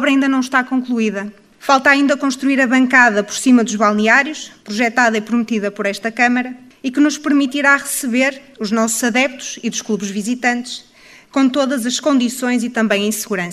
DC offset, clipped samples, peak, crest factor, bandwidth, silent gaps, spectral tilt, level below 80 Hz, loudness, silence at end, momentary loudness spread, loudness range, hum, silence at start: under 0.1%; under 0.1%; 0 dBFS; 16 dB; 15.5 kHz; none; -3.5 dB/octave; -62 dBFS; -15 LUFS; 0 s; 11 LU; 5 LU; none; 0 s